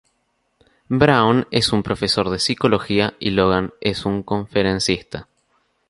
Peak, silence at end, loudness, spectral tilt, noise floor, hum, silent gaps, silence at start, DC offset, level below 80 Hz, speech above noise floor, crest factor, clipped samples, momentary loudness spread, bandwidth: -2 dBFS; 0.65 s; -19 LUFS; -5 dB/octave; -68 dBFS; none; none; 0.9 s; under 0.1%; -44 dBFS; 50 dB; 18 dB; under 0.1%; 8 LU; 11.5 kHz